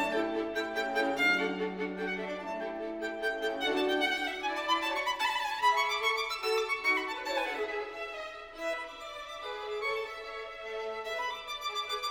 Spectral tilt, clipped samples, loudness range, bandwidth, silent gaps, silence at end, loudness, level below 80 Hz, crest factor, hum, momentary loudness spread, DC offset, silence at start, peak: -2.5 dB/octave; under 0.1%; 7 LU; 19 kHz; none; 0 s; -32 LUFS; -64 dBFS; 18 dB; none; 11 LU; under 0.1%; 0 s; -16 dBFS